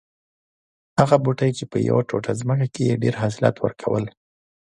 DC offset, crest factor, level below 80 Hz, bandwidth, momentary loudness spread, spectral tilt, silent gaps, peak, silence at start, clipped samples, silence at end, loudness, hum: under 0.1%; 22 dB; -54 dBFS; 11 kHz; 8 LU; -7 dB/octave; none; 0 dBFS; 0.95 s; under 0.1%; 0.6 s; -22 LUFS; none